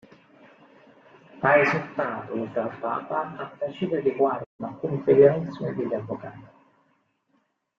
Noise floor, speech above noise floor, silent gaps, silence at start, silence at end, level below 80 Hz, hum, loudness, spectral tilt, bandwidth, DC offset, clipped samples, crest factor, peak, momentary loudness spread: -70 dBFS; 46 dB; 4.46-4.59 s; 1.35 s; 1.35 s; -68 dBFS; none; -25 LUFS; -8 dB/octave; 6.6 kHz; under 0.1%; under 0.1%; 22 dB; -4 dBFS; 14 LU